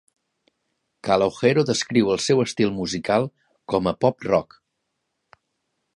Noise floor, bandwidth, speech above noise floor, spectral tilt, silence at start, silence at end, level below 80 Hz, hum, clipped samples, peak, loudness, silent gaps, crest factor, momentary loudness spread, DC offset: -77 dBFS; 11.5 kHz; 56 dB; -5 dB/octave; 1.05 s; 1.55 s; -56 dBFS; none; under 0.1%; -4 dBFS; -22 LUFS; none; 20 dB; 6 LU; under 0.1%